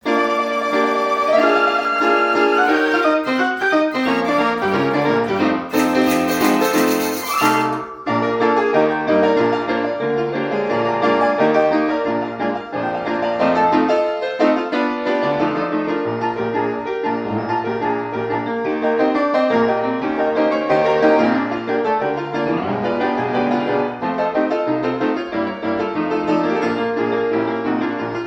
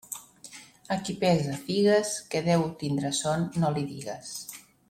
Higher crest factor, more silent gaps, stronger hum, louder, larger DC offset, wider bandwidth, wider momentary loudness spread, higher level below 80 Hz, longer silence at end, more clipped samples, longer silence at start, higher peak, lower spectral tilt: about the same, 16 dB vs 18 dB; neither; neither; first, -18 LUFS vs -28 LUFS; neither; first, 18 kHz vs 16 kHz; second, 6 LU vs 18 LU; about the same, -58 dBFS vs -62 dBFS; second, 0 s vs 0.3 s; neither; about the same, 0.05 s vs 0.1 s; first, -2 dBFS vs -10 dBFS; about the same, -5 dB/octave vs -5 dB/octave